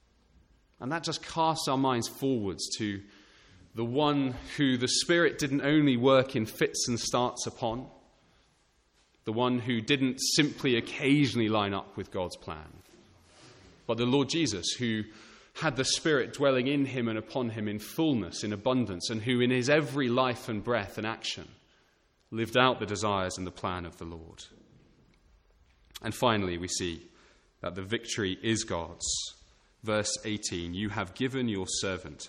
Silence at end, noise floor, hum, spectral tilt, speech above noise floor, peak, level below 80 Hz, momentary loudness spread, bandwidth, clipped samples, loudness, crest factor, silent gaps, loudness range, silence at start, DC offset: 0 s; -68 dBFS; none; -4 dB/octave; 39 dB; -8 dBFS; -60 dBFS; 14 LU; 16.5 kHz; under 0.1%; -29 LUFS; 24 dB; none; 7 LU; 0.8 s; under 0.1%